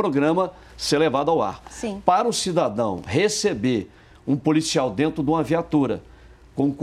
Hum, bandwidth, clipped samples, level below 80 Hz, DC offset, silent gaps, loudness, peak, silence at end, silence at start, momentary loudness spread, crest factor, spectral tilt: none; 14 kHz; under 0.1%; -50 dBFS; under 0.1%; none; -22 LUFS; -2 dBFS; 0 s; 0 s; 9 LU; 20 dB; -5 dB/octave